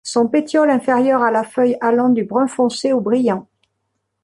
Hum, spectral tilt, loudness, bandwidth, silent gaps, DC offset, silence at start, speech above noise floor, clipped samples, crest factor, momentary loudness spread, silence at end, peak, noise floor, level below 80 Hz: none; -5 dB/octave; -16 LUFS; 11.5 kHz; none; under 0.1%; 0.05 s; 57 dB; under 0.1%; 14 dB; 4 LU; 0.8 s; -4 dBFS; -73 dBFS; -64 dBFS